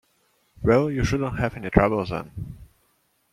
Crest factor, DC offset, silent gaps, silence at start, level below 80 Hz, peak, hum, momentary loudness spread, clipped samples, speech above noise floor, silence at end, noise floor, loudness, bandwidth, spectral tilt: 22 dB; under 0.1%; none; 0.6 s; -40 dBFS; -2 dBFS; none; 16 LU; under 0.1%; 45 dB; 0.7 s; -67 dBFS; -23 LUFS; 14.5 kHz; -7 dB/octave